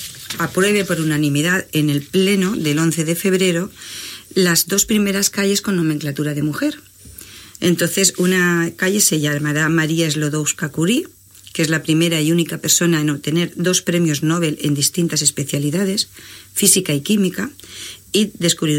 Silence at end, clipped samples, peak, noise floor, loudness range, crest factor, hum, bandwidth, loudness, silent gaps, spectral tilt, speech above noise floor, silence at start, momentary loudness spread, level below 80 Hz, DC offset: 0 s; under 0.1%; 0 dBFS; -39 dBFS; 2 LU; 18 dB; none; 17 kHz; -17 LUFS; none; -4 dB/octave; 22 dB; 0 s; 11 LU; -54 dBFS; under 0.1%